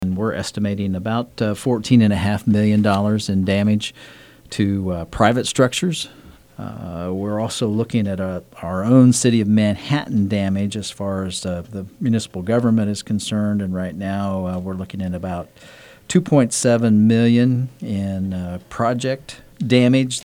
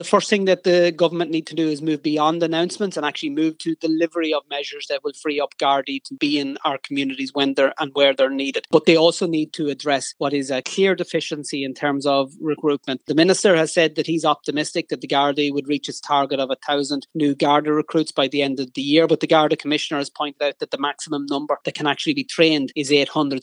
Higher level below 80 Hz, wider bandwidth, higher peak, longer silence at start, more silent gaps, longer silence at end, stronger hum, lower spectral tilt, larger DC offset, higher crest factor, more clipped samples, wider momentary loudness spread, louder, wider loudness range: first, -48 dBFS vs -86 dBFS; first, 15 kHz vs 11 kHz; about the same, 0 dBFS vs 0 dBFS; about the same, 0 s vs 0 s; neither; about the same, 0.05 s vs 0 s; neither; first, -6 dB/octave vs -4.5 dB/octave; neither; about the same, 18 dB vs 20 dB; neither; first, 13 LU vs 8 LU; about the same, -19 LUFS vs -20 LUFS; about the same, 4 LU vs 4 LU